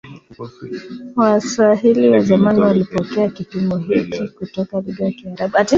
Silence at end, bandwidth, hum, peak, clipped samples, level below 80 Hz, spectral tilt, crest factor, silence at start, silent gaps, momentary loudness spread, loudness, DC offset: 0 s; 7.6 kHz; none; -2 dBFS; under 0.1%; -52 dBFS; -6.5 dB/octave; 16 dB; 0.05 s; none; 17 LU; -16 LUFS; under 0.1%